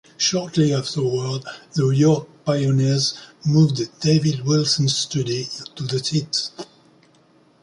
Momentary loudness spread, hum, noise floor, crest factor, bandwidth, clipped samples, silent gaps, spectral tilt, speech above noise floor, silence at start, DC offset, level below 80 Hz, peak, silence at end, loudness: 10 LU; none; -56 dBFS; 16 dB; 11 kHz; under 0.1%; none; -5.5 dB/octave; 35 dB; 0.2 s; under 0.1%; -58 dBFS; -4 dBFS; 1 s; -21 LUFS